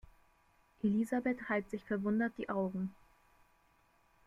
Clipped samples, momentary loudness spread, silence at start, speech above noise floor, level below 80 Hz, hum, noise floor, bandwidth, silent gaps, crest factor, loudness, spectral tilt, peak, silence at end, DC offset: under 0.1%; 6 LU; 0.85 s; 36 dB; -68 dBFS; none; -71 dBFS; 12.5 kHz; none; 16 dB; -36 LUFS; -8 dB/octave; -22 dBFS; 1.35 s; under 0.1%